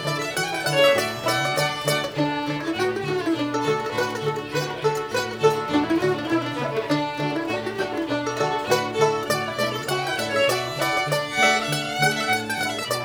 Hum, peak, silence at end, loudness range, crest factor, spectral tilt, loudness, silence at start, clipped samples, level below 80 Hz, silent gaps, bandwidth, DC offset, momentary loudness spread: none; -4 dBFS; 0 s; 2 LU; 18 dB; -4 dB/octave; -23 LUFS; 0 s; under 0.1%; -58 dBFS; none; over 20 kHz; under 0.1%; 7 LU